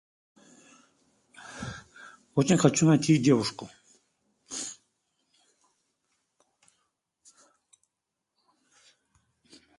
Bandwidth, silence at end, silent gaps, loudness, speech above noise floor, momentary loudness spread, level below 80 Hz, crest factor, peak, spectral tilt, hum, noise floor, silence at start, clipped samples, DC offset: 11.5 kHz; 5.05 s; none; -25 LUFS; 62 dB; 28 LU; -66 dBFS; 26 dB; -6 dBFS; -5.5 dB/octave; none; -85 dBFS; 1.45 s; under 0.1%; under 0.1%